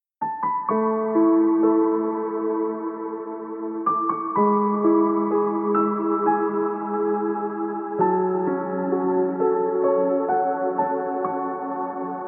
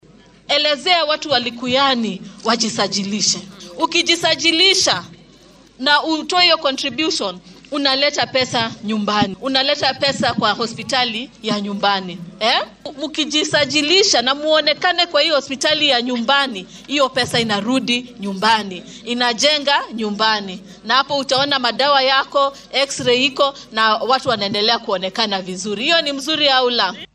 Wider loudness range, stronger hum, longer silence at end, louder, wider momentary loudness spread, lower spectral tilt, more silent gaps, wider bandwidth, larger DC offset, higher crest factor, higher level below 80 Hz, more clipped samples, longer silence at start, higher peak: about the same, 2 LU vs 3 LU; neither; about the same, 0 s vs 0.1 s; second, -23 LUFS vs -16 LUFS; about the same, 9 LU vs 9 LU; first, -13.5 dB/octave vs -2.5 dB/octave; neither; second, 2.8 kHz vs 13 kHz; neither; about the same, 14 dB vs 18 dB; second, -80 dBFS vs -58 dBFS; neither; second, 0.2 s vs 0.5 s; second, -8 dBFS vs 0 dBFS